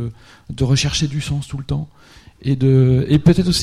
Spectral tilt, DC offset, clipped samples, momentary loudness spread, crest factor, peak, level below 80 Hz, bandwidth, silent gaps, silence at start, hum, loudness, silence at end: -6 dB/octave; under 0.1%; under 0.1%; 14 LU; 16 dB; -2 dBFS; -36 dBFS; 13 kHz; none; 0 s; none; -17 LUFS; 0 s